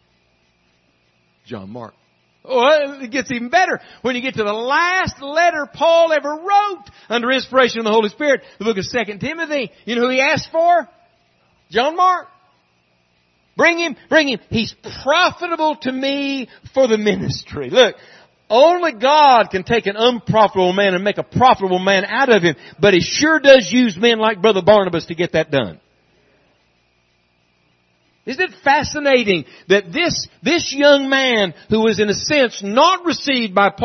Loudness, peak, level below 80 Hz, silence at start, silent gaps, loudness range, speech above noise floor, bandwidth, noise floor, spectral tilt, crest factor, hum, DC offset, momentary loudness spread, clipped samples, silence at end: -16 LUFS; 0 dBFS; -52 dBFS; 1.5 s; none; 6 LU; 45 dB; 6.4 kHz; -61 dBFS; -4 dB/octave; 16 dB; none; under 0.1%; 10 LU; under 0.1%; 0 s